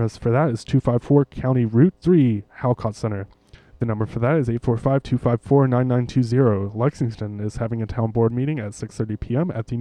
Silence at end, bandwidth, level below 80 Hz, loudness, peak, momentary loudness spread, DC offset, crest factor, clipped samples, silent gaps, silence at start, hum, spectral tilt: 0 s; 9.8 kHz; -44 dBFS; -21 LUFS; -4 dBFS; 10 LU; under 0.1%; 16 dB; under 0.1%; none; 0 s; none; -9 dB/octave